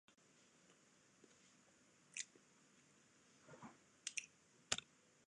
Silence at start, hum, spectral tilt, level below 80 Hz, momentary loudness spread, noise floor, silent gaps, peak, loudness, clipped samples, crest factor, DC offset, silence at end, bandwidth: 0.1 s; none; 0 dB/octave; -88 dBFS; 24 LU; -73 dBFS; none; -20 dBFS; -48 LUFS; under 0.1%; 36 dB; under 0.1%; 0.45 s; 10.5 kHz